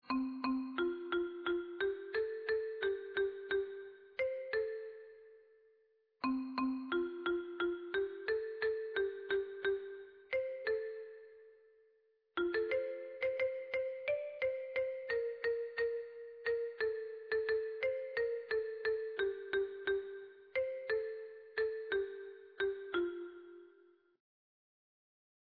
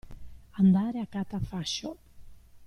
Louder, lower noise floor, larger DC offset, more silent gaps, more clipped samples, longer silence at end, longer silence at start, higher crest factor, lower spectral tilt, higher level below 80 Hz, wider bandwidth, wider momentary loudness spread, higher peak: second, -39 LUFS vs -28 LUFS; first, -74 dBFS vs -48 dBFS; neither; neither; neither; first, 1.9 s vs 0 s; about the same, 0.05 s vs 0.05 s; about the same, 16 dB vs 16 dB; second, -1.5 dB/octave vs -6 dB/octave; second, -74 dBFS vs -50 dBFS; second, 5.2 kHz vs 9.8 kHz; second, 10 LU vs 14 LU; second, -24 dBFS vs -14 dBFS